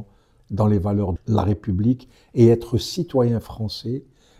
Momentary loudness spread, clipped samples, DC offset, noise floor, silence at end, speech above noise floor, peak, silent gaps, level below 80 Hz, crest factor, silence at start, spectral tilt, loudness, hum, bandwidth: 13 LU; under 0.1%; under 0.1%; -47 dBFS; 0.4 s; 27 dB; -4 dBFS; none; -42 dBFS; 18 dB; 0 s; -8 dB/octave; -21 LUFS; none; 14 kHz